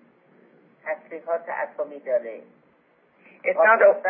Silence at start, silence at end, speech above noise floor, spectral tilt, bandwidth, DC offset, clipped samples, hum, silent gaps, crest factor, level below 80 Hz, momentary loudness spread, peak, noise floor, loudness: 0.85 s; 0 s; 39 dB; -8 dB/octave; 3.3 kHz; under 0.1%; under 0.1%; none; none; 20 dB; under -90 dBFS; 20 LU; -4 dBFS; -61 dBFS; -23 LUFS